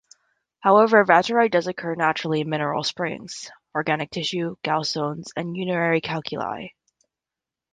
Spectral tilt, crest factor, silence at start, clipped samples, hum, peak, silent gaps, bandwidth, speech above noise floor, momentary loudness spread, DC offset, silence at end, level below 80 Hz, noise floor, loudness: -5 dB/octave; 22 dB; 0.65 s; under 0.1%; none; -2 dBFS; none; 9.6 kHz; 66 dB; 14 LU; under 0.1%; 1.05 s; -66 dBFS; -88 dBFS; -22 LUFS